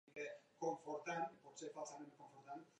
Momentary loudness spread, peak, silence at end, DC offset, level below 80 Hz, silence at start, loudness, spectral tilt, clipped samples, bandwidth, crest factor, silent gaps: 12 LU; -30 dBFS; 0.1 s; under 0.1%; under -90 dBFS; 0.05 s; -49 LUFS; -4 dB/octave; under 0.1%; 10 kHz; 18 dB; none